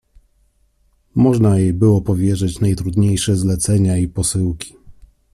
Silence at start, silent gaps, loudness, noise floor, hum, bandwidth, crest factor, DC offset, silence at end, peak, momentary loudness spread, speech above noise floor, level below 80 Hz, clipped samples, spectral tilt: 1.15 s; none; -16 LUFS; -59 dBFS; none; 13.5 kHz; 14 dB; under 0.1%; 0.4 s; -2 dBFS; 7 LU; 44 dB; -38 dBFS; under 0.1%; -6.5 dB/octave